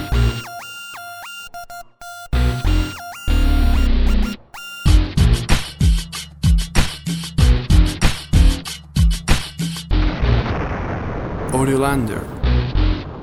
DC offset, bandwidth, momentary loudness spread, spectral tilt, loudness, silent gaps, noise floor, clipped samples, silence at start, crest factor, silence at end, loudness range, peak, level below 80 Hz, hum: under 0.1%; over 20 kHz; 15 LU; -5.5 dB/octave; -19 LUFS; none; -36 dBFS; under 0.1%; 0 s; 16 dB; 0 s; 4 LU; 0 dBFS; -18 dBFS; none